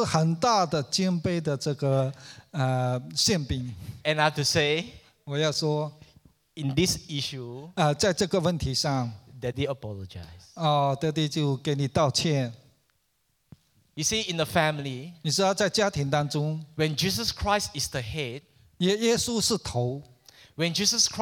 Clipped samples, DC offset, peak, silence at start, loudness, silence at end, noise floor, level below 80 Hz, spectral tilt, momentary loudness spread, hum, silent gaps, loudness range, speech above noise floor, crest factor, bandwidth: under 0.1%; under 0.1%; -6 dBFS; 0 s; -26 LUFS; 0 s; -72 dBFS; -52 dBFS; -4 dB/octave; 13 LU; none; none; 2 LU; 45 dB; 20 dB; 18.5 kHz